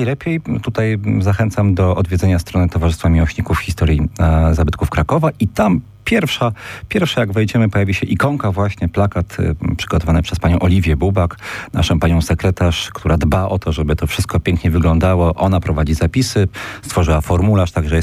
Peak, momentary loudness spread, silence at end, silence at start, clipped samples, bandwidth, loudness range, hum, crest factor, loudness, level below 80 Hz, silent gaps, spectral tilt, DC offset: -2 dBFS; 5 LU; 0 s; 0 s; under 0.1%; 15 kHz; 1 LU; none; 12 dB; -16 LUFS; -24 dBFS; none; -6.5 dB/octave; under 0.1%